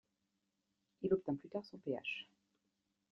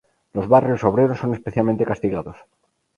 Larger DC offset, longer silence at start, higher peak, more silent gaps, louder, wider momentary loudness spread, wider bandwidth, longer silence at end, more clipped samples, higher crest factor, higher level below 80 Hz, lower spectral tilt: neither; first, 1 s vs 0.35 s; second, -22 dBFS vs 0 dBFS; neither; second, -42 LUFS vs -20 LUFS; second, 10 LU vs 13 LU; second, 6.6 kHz vs 10.5 kHz; first, 0.9 s vs 0.65 s; neither; about the same, 22 dB vs 20 dB; second, -78 dBFS vs -50 dBFS; second, -4.5 dB/octave vs -9.5 dB/octave